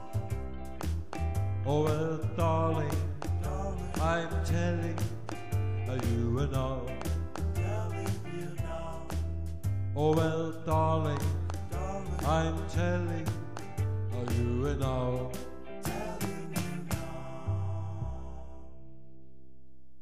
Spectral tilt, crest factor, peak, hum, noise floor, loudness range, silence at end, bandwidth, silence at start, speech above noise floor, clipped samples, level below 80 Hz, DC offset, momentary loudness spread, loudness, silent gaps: -7 dB/octave; 18 dB; -16 dBFS; none; -61 dBFS; 6 LU; 1 s; 15.5 kHz; 0 s; 31 dB; under 0.1%; -42 dBFS; 1%; 10 LU; -33 LUFS; none